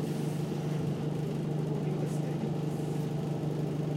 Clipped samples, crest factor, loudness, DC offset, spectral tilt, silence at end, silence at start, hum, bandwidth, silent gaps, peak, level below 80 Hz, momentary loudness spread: under 0.1%; 12 dB; -33 LUFS; under 0.1%; -8 dB/octave; 0 s; 0 s; 50 Hz at -35 dBFS; 14.5 kHz; none; -22 dBFS; -60 dBFS; 1 LU